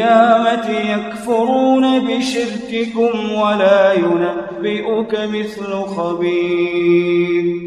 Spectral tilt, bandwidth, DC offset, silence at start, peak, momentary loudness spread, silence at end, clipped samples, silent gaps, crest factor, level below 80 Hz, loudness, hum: -5.5 dB/octave; 11 kHz; under 0.1%; 0 s; 0 dBFS; 9 LU; 0 s; under 0.1%; none; 14 dB; -56 dBFS; -16 LUFS; none